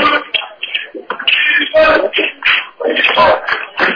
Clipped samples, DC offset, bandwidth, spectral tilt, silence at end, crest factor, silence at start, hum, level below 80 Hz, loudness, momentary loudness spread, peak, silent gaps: under 0.1%; under 0.1%; 5.4 kHz; -4 dB/octave; 0 s; 12 dB; 0 s; none; -46 dBFS; -12 LUFS; 10 LU; -2 dBFS; none